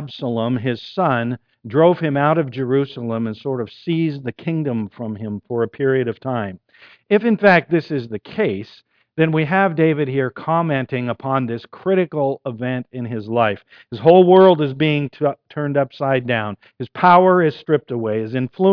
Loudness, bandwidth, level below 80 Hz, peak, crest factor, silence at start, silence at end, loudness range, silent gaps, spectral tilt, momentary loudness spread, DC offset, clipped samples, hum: -18 LUFS; 5.4 kHz; -62 dBFS; 0 dBFS; 18 dB; 0 s; 0 s; 7 LU; none; -9.5 dB/octave; 13 LU; under 0.1%; under 0.1%; none